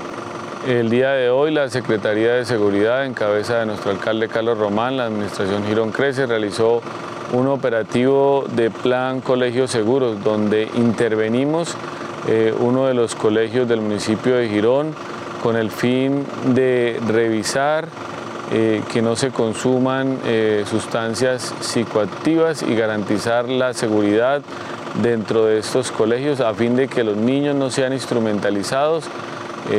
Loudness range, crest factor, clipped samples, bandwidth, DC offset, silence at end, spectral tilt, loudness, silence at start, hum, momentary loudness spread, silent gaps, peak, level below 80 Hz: 1 LU; 16 dB; under 0.1%; 14.5 kHz; under 0.1%; 0 s; -5.5 dB/octave; -19 LUFS; 0 s; none; 6 LU; none; -2 dBFS; -62 dBFS